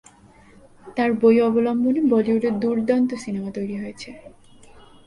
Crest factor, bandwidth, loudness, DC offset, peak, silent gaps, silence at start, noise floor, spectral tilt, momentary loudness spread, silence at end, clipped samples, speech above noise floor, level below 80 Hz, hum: 16 dB; 11 kHz; -21 LUFS; under 0.1%; -6 dBFS; none; 0.85 s; -50 dBFS; -7 dB/octave; 15 LU; 0.25 s; under 0.1%; 30 dB; -58 dBFS; none